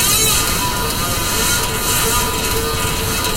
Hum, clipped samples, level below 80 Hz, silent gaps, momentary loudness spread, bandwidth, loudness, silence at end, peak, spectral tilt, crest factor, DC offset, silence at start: none; under 0.1%; -28 dBFS; none; 5 LU; 16 kHz; -15 LUFS; 0 s; -2 dBFS; -2 dB/octave; 16 dB; under 0.1%; 0 s